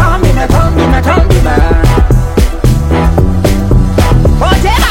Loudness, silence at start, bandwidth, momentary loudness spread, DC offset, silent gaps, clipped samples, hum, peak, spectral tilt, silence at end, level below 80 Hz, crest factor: -9 LUFS; 0 s; 16.5 kHz; 2 LU; under 0.1%; none; 0.5%; none; 0 dBFS; -6.5 dB/octave; 0 s; -10 dBFS; 6 dB